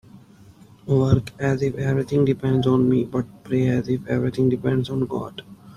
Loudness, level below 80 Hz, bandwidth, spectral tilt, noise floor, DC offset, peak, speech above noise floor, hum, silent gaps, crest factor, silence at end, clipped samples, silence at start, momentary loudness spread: -22 LUFS; -48 dBFS; 10.5 kHz; -8.5 dB/octave; -48 dBFS; under 0.1%; -4 dBFS; 27 dB; none; none; 18 dB; 0.05 s; under 0.1%; 0.15 s; 9 LU